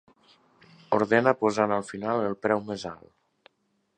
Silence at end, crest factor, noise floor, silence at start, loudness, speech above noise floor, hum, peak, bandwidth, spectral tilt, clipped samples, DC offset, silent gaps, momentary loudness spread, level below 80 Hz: 1 s; 24 dB; -73 dBFS; 0.9 s; -26 LUFS; 48 dB; none; -4 dBFS; 9.8 kHz; -6 dB/octave; under 0.1%; under 0.1%; none; 14 LU; -66 dBFS